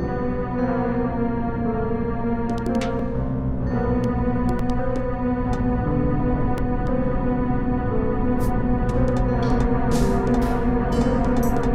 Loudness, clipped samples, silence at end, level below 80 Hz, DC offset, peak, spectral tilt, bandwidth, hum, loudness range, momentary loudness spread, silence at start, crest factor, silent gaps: -23 LUFS; under 0.1%; 0 s; -28 dBFS; under 0.1%; -8 dBFS; -8 dB/octave; 14 kHz; none; 3 LU; 4 LU; 0 s; 14 dB; none